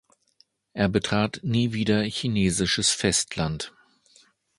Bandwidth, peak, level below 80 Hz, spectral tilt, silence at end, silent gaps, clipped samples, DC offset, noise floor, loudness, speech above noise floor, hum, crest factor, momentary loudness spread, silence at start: 11.5 kHz; -6 dBFS; -48 dBFS; -4 dB/octave; 0.9 s; none; under 0.1%; under 0.1%; -64 dBFS; -24 LUFS; 40 dB; none; 20 dB; 8 LU; 0.75 s